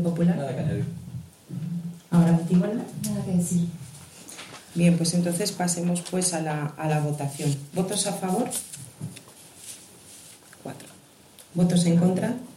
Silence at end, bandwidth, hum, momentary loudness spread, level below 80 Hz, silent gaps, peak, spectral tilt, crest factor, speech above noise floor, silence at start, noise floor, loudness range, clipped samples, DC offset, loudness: 0.05 s; 15 kHz; none; 21 LU; -62 dBFS; none; -10 dBFS; -5.5 dB/octave; 16 dB; 27 dB; 0 s; -51 dBFS; 6 LU; under 0.1%; under 0.1%; -25 LUFS